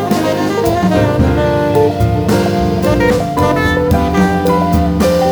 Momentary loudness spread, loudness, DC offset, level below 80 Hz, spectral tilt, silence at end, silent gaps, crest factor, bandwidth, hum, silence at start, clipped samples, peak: 2 LU; -13 LUFS; under 0.1%; -24 dBFS; -6.5 dB/octave; 0 s; none; 12 dB; over 20 kHz; none; 0 s; under 0.1%; 0 dBFS